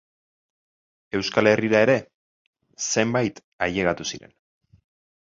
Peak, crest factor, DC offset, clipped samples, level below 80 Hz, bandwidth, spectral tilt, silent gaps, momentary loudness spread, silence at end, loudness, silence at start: -2 dBFS; 22 dB; under 0.1%; under 0.1%; -56 dBFS; 7.8 kHz; -4 dB/octave; 2.14-2.53 s, 3.44-3.59 s; 12 LU; 1.2 s; -22 LUFS; 1.15 s